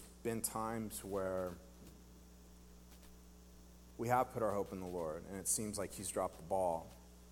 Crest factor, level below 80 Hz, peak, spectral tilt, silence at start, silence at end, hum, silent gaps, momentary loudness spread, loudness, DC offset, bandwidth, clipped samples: 22 dB; -62 dBFS; -20 dBFS; -4 dB/octave; 0 s; 0 s; 60 Hz at -60 dBFS; none; 24 LU; -40 LUFS; under 0.1%; 17.5 kHz; under 0.1%